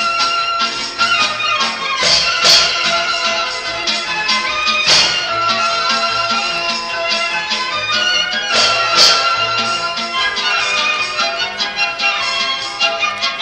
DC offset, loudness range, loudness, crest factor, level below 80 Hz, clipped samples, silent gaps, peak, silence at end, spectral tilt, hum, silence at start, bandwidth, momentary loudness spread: under 0.1%; 3 LU; -13 LUFS; 16 dB; -50 dBFS; under 0.1%; none; 0 dBFS; 0 s; 0 dB/octave; none; 0 s; 11.5 kHz; 8 LU